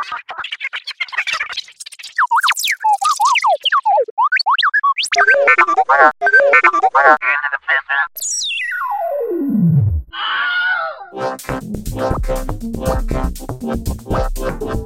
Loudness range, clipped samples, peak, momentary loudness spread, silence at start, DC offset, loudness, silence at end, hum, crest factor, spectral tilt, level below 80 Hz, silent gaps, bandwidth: 10 LU; under 0.1%; -2 dBFS; 14 LU; 0 s; under 0.1%; -15 LUFS; 0 s; none; 14 dB; -3.5 dB/octave; -30 dBFS; 4.11-4.17 s; 16.5 kHz